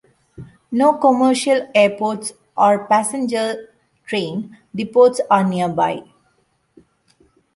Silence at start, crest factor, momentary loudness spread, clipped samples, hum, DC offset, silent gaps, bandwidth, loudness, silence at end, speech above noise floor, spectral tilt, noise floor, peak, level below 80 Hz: 0.4 s; 18 dB; 13 LU; under 0.1%; none; under 0.1%; none; 11.5 kHz; -17 LUFS; 1.55 s; 47 dB; -5 dB/octave; -63 dBFS; -2 dBFS; -62 dBFS